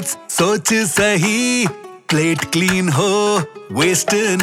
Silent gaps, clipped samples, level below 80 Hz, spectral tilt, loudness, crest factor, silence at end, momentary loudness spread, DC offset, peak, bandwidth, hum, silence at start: none; under 0.1%; -50 dBFS; -3.5 dB/octave; -16 LUFS; 14 dB; 0 s; 6 LU; under 0.1%; -2 dBFS; 18 kHz; none; 0 s